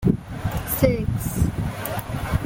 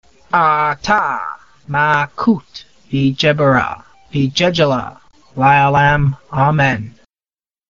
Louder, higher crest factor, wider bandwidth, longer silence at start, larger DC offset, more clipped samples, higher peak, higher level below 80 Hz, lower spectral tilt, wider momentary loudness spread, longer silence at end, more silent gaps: second, -24 LUFS vs -15 LUFS; about the same, 20 dB vs 16 dB; first, 17 kHz vs 7.2 kHz; second, 0 s vs 0.35 s; second, under 0.1% vs 0.3%; neither; about the same, -2 dBFS vs 0 dBFS; first, -34 dBFS vs -44 dBFS; first, -6.5 dB/octave vs -4 dB/octave; second, 8 LU vs 12 LU; second, 0 s vs 0.8 s; neither